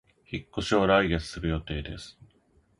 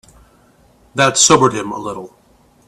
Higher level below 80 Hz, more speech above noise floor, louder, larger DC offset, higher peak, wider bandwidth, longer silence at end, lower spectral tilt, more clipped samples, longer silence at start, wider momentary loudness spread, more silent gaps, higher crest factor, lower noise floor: first, -42 dBFS vs -52 dBFS; about the same, 37 dB vs 37 dB; second, -27 LUFS vs -13 LUFS; neither; second, -6 dBFS vs 0 dBFS; second, 11.5 kHz vs 16 kHz; about the same, 0.7 s vs 0.6 s; first, -5.5 dB/octave vs -2.5 dB/octave; neither; second, 0.3 s vs 0.95 s; about the same, 18 LU vs 18 LU; neither; about the same, 22 dB vs 18 dB; first, -65 dBFS vs -51 dBFS